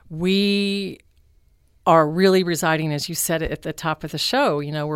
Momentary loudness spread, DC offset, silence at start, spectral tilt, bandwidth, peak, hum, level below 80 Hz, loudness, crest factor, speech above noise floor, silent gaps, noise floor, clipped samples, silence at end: 10 LU; under 0.1%; 0.1 s; -4.5 dB/octave; 16.5 kHz; -2 dBFS; none; -48 dBFS; -20 LUFS; 18 dB; 38 dB; none; -58 dBFS; under 0.1%; 0 s